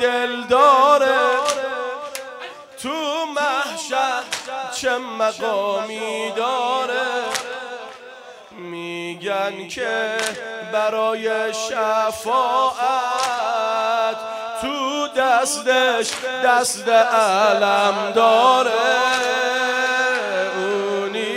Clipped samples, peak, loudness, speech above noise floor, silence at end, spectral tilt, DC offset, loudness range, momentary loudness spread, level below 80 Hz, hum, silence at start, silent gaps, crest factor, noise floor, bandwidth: under 0.1%; -2 dBFS; -19 LUFS; 21 dB; 0 s; -1.5 dB/octave; under 0.1%; 8 LU; 13 LU; -64 dBFS; none; 0 s; none; 18 dB; -40 dBFS; 16 kHz